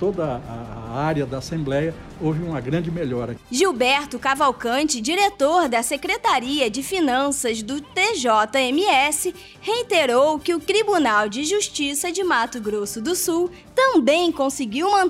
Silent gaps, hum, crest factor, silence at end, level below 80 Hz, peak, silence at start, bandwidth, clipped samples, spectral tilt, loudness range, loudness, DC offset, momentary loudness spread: none; none; 14 dB; 0 s; -50 dBFS; -6 dBFS; 0 s; 16 kHz; under 0.1%; -3.5 dB/octave; 3 LU; -21 LUFS; under 0.1%; 9 LU